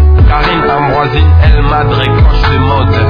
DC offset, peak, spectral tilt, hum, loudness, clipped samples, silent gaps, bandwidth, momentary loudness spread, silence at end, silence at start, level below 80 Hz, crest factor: under 0.1%; 0 dBFS; -8.5 dB/octave; none; -9 LUFS; 1%; none; 5.2 kHz; 3 LU; 0 s; 0 s; -10 dBFS; 6 dB